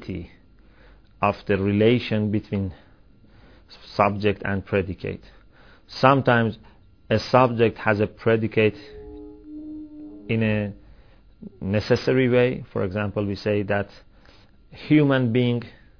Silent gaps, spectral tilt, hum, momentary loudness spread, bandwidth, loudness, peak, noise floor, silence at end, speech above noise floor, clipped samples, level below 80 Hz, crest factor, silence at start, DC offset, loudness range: none; -8 dB/octave; none; 20 LU; 5.4 kHz; -22 LUFS; -2 dBFS; -53 dBFS; 0.3 s; 31 dB; under 0.1%; -50 dBFS; 22 dB; 0 s; 0.2%; 6 LU